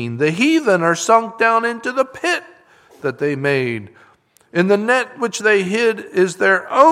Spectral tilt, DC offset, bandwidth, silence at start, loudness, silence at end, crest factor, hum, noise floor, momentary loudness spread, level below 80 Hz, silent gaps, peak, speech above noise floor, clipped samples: -4.5 dB/octave; under 0.1%; 14.5 kHz; 0 s; -17 LUFS; 0 s; 16 dB; none; -51 dBFS; 8 LU; -66 dBFS; none; 0 dBFS; 34 dB; under 0.1%